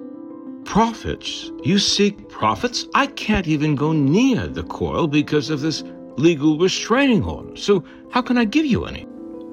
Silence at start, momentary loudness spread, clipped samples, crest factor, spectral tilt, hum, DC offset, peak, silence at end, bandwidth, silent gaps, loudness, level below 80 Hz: 0 s; 12 LU; under 0.1%; 16 dB; -5 dB/octave; none; under 0.1%; -4 dBFS; 0 s; 12 kHz; none; -20 LUFS; -44 dBFS